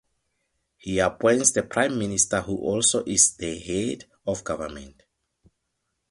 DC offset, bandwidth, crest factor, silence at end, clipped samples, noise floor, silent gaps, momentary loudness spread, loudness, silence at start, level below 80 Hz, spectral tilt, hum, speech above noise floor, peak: under 0.1%; 11.5 kHz; 22 dB; 1.2 s; under 0.1%; -78 dBFS; none; 14 LU; -23 LUFS; 0.85 s; -52 dBFS; -3 dB/octave; none; 54 dB; -4 dBFS